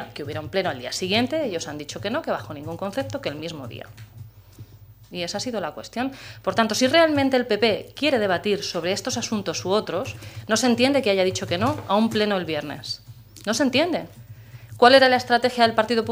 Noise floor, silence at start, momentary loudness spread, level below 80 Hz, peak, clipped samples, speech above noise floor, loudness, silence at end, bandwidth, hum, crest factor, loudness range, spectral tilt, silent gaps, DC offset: -47 dBFS; 0 s; 15 LU; -58 dBFS; 0 dBFS; under 0.1%; 24 dB; -22 LUFS; 0 s; 16 kHz; none; 22 dB; 11 LU; -4 dB/octave; none; under 0.1%